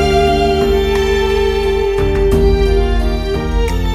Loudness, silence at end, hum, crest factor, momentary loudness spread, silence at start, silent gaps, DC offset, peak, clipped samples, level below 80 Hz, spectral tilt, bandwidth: -14 LUFS; 0 s; none; 12 dB; 5 LU; 0 s; none; under 0.1%; 0 dBFS; under 0.1%; -18 dBFS; -6 dB/octave; 14 kHz